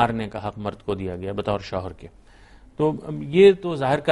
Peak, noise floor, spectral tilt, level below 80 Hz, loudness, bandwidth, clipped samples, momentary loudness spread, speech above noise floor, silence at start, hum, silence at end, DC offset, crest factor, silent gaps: -4 dBFS; -49 dBFS; -7 dB/octave; -50 dBFS; -23 LUFS; 10.5 kHz; under 0.1%; 16 LU; 27 dB; 0 s; none; 0 s; under 0.1%; 18 dB; none